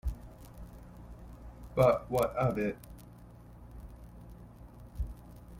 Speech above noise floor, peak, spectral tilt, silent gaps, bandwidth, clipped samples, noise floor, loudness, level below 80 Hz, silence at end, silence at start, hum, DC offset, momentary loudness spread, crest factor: 23 dB; -12 dBFS; -7.5 dB/octave; none; 16.5 kHz; under 0.1%; -52 dBFS; -31 LUFS; -46 dBFS; 0 s; 0.05 s; none; under 0.1%; 25 LU; 22 dB